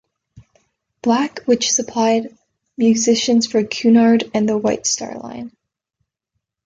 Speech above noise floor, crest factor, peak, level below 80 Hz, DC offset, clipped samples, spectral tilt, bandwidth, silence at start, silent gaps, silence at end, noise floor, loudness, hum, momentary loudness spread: 61 dB; 16 dB; -4 dBFS; -60 dBFS; under 0.1%; under 0.1%; -3.5 dB/octave; 7.8 kHz; 0.35 s; none; 1.15 s; -77 dBFS; -17 LUFS; none; 16 LU